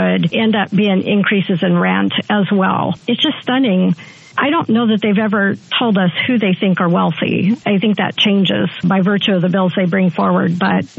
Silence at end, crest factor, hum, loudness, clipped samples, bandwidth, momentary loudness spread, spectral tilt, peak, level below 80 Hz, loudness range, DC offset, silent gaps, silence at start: 0.1 s; 12 dB; none; -15 LUFS; under 0.1%; 6.8 kHz; 2 LU; -7.5 dB/octave; -2 dBFS; -64 dBFS; 1 LU; under 0.1%; none; 0 s